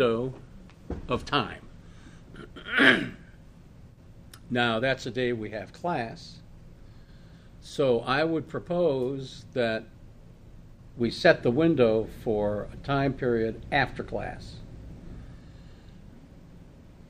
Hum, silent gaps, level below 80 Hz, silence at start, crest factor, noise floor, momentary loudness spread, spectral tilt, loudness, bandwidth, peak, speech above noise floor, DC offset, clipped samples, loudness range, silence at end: none; none; -50 dBFS; 0 s; 24 dB; -50 dBFS; 24 LU; -6 dB/octave; -27 LUFS; 14.5 kHz; -4 dBFS; 23 dB; under 0.1%; under 0.1%; 6 LU; 0.2 s